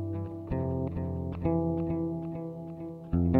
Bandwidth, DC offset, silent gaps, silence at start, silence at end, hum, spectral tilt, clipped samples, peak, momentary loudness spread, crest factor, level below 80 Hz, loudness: 4.1 kHz; under 0.1%; none; 0 s; 0 s; none; -12 dB/octave; under 0.1%; -10 dBFS; 10 LU; 20 dB; -44 dBFS; -33 LUFS